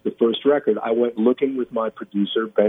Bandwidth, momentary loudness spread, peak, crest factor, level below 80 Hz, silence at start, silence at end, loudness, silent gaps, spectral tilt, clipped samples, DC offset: 3.9 kHz; 6 LU; -4 dBFS; 16 dB; -70 dBFS; 0.05 s; 0 s; -21 LUFS; none; -8.5 dB/octave; under 0.1%; under 0.1%